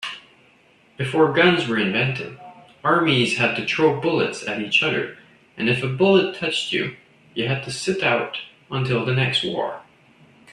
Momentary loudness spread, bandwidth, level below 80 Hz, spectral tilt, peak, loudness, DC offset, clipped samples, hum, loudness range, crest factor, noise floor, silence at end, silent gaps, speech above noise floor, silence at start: 13 LU; 11.5 kHz; -60 dBFS; -5 dB/octave; -2 dBFS; -21 LUFS; under 0.1%; under 0.1%; none; 4 LU; 20 dB; -56 dBFS; 0 s; none; 35 dB; 0 s